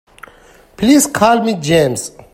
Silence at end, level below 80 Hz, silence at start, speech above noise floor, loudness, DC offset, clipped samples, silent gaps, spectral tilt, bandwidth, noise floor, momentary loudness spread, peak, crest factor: 0.25 s; -44 dBFS; 0.8 s; 32 dB; -13 LUFS; under 0.1%; under 0.1%; none; -4.5 dB/octave; 16 kHz; -45 dBFS; 7 LU; 0 dBFS; 14 dB